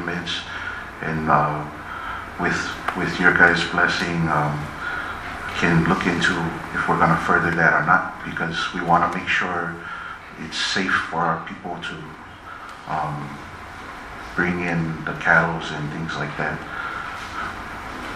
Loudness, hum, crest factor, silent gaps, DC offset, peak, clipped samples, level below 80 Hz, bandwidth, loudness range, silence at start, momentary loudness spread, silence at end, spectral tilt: -22 LUFS; none; 22 dB; none; under 0.1%; 0 dBFS; under 0.1%; -46 dBFS; 13.5 kHz; 7 LU; 0 s; 15 LU; 0 s; -5 dB/octave